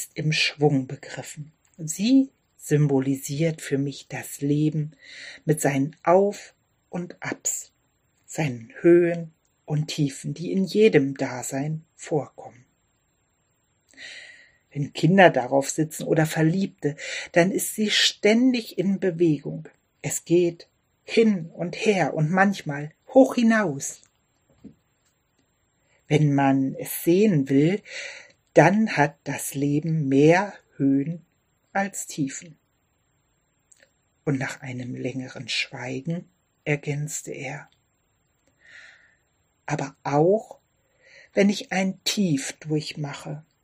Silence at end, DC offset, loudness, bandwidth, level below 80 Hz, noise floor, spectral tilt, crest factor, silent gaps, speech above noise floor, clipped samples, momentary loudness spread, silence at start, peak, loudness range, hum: 0.25 s; under 0.1%; -23 LUFS; 15.5 kHz; -68 dBFS; -69 dBFS; -5 dB/octave; 22 dB; none; 46 dB; under 0.1%; 17 LU; 0 s; -2 dBFS; 10 LU; none